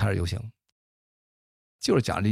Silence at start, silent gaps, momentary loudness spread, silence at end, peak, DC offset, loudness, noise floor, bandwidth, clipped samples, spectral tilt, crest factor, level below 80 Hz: 0 s; 0.72-1.79 s; 13 LU; 0 s; -10 dBFS; under 0.1%; -27 LUFS; under -90 dBFS; 15 kHz; under 0.1%; -6 dB/octave; 18 dB; -48 dBFS